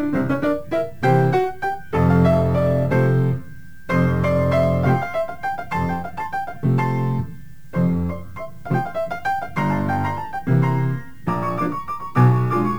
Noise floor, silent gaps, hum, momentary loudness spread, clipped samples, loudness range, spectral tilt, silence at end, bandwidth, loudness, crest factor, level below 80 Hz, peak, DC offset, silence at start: -41 dBFS; none; none; 10 LU; under 0.1%; 5 LU; -9 dB/octave; 0 s; 9 kHz; -21 LUFS; 16 dB; -42 dBFS; -4 dBFS; 2%; 0 s